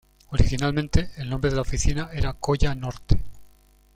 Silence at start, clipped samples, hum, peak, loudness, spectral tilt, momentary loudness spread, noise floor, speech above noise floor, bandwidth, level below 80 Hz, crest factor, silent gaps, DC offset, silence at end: 0.3 s; under 0.1%; none; -2 dBFS; -26 LUFS; -5.5 dB/octave; 7 LU; -55 dBFS; 33 dB; 11 kHz; -28 dBFS; 20 dB; none; under 0.1%; 0.5 s